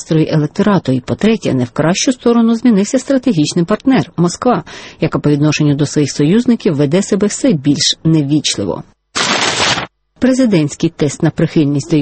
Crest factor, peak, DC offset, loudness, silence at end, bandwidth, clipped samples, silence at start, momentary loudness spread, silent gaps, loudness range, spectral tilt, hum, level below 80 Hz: 12 dB; 0 dBFS; under 0.1%; -13 LUFS; 0 s; 8.8 kHz; under 0.1%; 0 s; 5 LU; none; 1 LU; -5 dB/octave; none; -46 dBFS